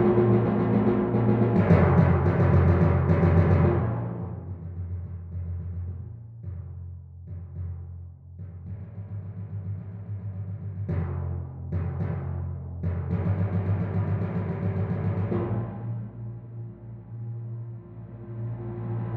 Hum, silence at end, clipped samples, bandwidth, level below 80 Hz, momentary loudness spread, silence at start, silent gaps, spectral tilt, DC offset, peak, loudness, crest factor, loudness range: none; 0 s; under 0.1%; 4.4 kHz; -44 dBFS; 20 LU; 0 s; none; -11.5 dB/octave; under 0.1%; -8 dBFS; -26 LUFS; 18 dB; 17 LU